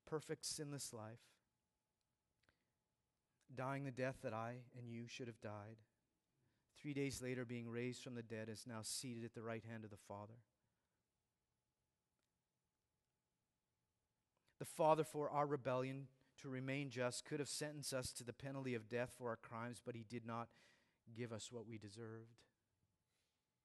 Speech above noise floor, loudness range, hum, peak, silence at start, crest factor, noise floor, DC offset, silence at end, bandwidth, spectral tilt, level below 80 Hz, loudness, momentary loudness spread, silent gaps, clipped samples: over 43 dB; 12 LU; none; -22 dBFS; 0.05 s; 28 dB; under -90 dBFS; under 0.1%; 1.2 s; 12 kHz; -4.5 dB/octave; -82 dBFS; -48 LUFS; 14 LU; none; under 0.1%